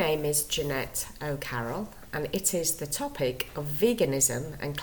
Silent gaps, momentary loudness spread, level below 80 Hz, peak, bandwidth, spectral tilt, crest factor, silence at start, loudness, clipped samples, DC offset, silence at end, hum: none; 9 LU; -50 dBFS; -10 dBFS; 19.5 kHz; -3.5 dB/octave; 20 dB; 0 s; -29 LUFS; under 0.1%; under 0.1%; 0 s; none